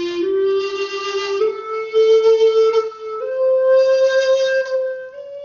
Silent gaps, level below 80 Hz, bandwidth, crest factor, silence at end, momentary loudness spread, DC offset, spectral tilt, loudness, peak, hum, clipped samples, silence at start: none; -64 dBFS; 7.2 kHz; 10 dB; 0 s; 12 LU; under 0.1%; 0 dB/octave; -17 LUFS; -6 dBFS; none; under 0.1%; 0 s